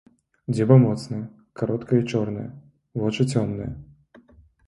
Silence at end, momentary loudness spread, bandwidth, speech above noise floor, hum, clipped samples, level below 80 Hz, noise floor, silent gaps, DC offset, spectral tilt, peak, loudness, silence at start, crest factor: 0.85 s; 20 LU; 11 kHz; 32 dB; none; under 0.1%; -52 dBFS; -54 dBFS; none; under 0.1%; -8 dB/octave; -2 dBFS; -23 LUFS; 0.5 s; 22 dB